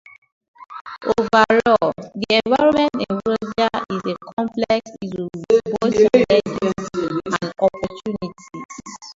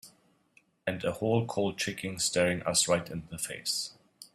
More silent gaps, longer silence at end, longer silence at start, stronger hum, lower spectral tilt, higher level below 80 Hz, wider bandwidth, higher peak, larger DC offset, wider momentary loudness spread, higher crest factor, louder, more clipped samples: first, 0.81-0.85 s, 4.33-4.37 s, 8.65-8.69 s vs none; about the same, 0.05 s vs 0.1 s; first, 0.6 s vs 0.05 s; neither; first, -5.5 dB/octave vs -3.5 dB/octave; first, -52 dBFS vs -64 dBFS; second, 7.8 kHz vs 15.5 kHz; first, 0 dBFS vs -12 dBFS; neither; first, 17 LU vs 10 LU; about the same, 20 dB vs 20 dB; first, -19 LUFS vs -30 LUFS; neither